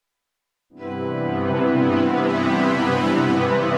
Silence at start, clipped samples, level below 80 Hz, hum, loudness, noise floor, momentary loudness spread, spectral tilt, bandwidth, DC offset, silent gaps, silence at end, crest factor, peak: 0.75 s; under 0.1%; -66 dBFS; none; -20 LUFS; -80 dBFS; 9 LU; -7 dB/octave; 10 kHz; under 0.1%; none; 0 s; 14 dB; -8 dBFS